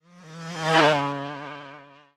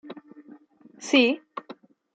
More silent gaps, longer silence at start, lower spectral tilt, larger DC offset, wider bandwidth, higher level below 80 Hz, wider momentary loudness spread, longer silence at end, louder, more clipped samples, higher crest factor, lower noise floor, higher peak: neither; about the same, 0.15 s vs 0.05 s; first, -4.5 dB/octave vs -2.5 dB/octave; neither; first, 13.5 kHz vs 9 kHz; first, -68 dBFS vs -84 dBFS; about the same, 22 LU vs 24 LU; about the same, 0.3 s vs 0.4 s; about the same, -22 LUFS vs -22 LUFS; neither; about the same, 22 dB vs 22 dB; second, -47 dBFS vs -52 dBFS; first, -4 dBFS vs -8 dBFS